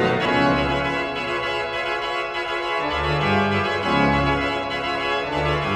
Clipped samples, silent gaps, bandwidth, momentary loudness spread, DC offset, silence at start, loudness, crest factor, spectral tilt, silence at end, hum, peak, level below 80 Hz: under 0.1%; none; 13 kHz; 5 LU; under 0.1%; 0 s; -22 LUFS; 16 dB; -6 dB/octave; 0 s; none; -6 dBFS; -38 dBFS